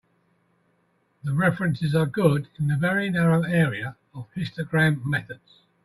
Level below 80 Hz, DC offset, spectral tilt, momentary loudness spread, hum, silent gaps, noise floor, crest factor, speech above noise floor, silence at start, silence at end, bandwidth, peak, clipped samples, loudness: -58 dBFS; under 0.1%; -7.5 dB/octave; 14 LU; none; none; -68 dBFS; 20 dB; 44 dB; 1.25 s; 0.5 s; 12.5 kHz; -6 dBFS; under 0.1%; -24 LUFS